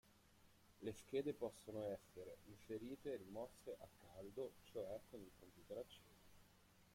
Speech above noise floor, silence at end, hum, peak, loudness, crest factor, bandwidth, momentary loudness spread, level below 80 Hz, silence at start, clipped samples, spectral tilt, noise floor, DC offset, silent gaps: 20 dB; 0 s; none; -32 dBFS; -53 LUFS; 20 dB; 16.5 kHz; 14 LU; -76 dBFS; 0.05 s; under 0.1%; -6 dB/octave; -72 dBFS; under 0.1%; none